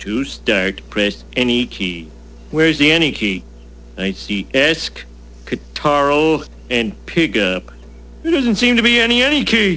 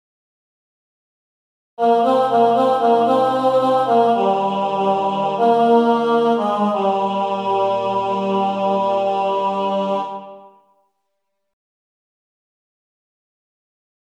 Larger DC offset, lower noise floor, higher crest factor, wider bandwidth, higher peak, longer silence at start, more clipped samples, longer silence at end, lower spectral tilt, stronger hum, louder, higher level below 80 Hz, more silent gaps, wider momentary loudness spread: first, 0.3% vs under 0.1%; second, -36 dBFS vs -76 dBFS; about the same, 18 dB vs 14 dB; second, 8 kHz vs 10 kHz; first, 0 dBFS vs -4 dBFS; second, 0 s vs 1.8 s; neither; second, 0 s vs 3.65 s; second, -4.5 dB/octave vs -7 dB/octave; first, 60 Hz at -40 dBFS vs none; about the same, -16 LUFS vs -17 LUFS; first, -38 dBFS vs -70 dBFS; neither; first, 14 LU vs 5 LU